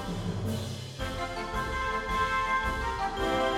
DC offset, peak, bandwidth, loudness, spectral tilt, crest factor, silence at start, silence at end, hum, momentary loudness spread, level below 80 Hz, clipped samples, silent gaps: under 0.1%; -16 dBFS; 16 kHz; -31 LUFS; -5 dB/octave; 16 dB; 0 s; 0 s; none; 7 LU; -42 dBFS; under 0.1%; none